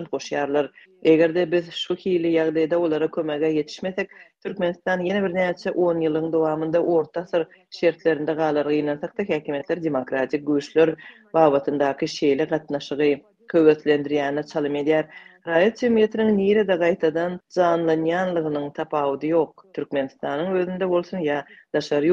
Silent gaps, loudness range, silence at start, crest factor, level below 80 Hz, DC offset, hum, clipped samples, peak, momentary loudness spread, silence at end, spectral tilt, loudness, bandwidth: none; 3 LU; 0 s; 20 dB; -64 dBFS; under 0.1%; none; under 0.1%; -2 dBFS; 9 LU; 0 s; -6.5 dB/octave; -22 LUFS; 7.6 kHz